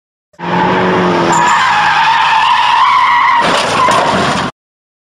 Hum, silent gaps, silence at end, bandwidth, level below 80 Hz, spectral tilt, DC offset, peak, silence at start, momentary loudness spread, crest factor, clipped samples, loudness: none; none; 0.6 s; 14 kHz; -46 dBFS; -3.5 dB/octave; under 0.1%; 0 dBFS; 0.4 s; 6 LU; 10 dB; under 0.1%; -10 LUFS